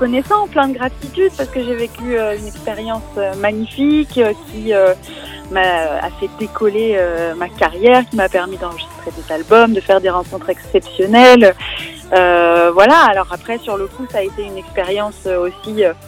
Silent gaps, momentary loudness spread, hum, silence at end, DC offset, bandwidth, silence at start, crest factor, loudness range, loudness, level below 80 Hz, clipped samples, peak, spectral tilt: none; 14 LU; none; 0 s; under 0.1%; 16.5 kHz; 0 s; 14 dB; 8 LU; -14 LUFS; -38 dBFS; 0.7%; 0 dBFS; -5 dB/octave